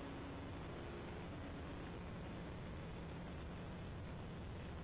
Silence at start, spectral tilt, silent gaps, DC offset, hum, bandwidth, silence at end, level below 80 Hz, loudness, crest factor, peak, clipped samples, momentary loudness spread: 0 s; -6 dB/octave; none; under 0.1%; none; 4 kHz; 0 s; -56 dBFS; -50 LUFS; 6 dB; -42 dBFS; under 0.1%; 1 LU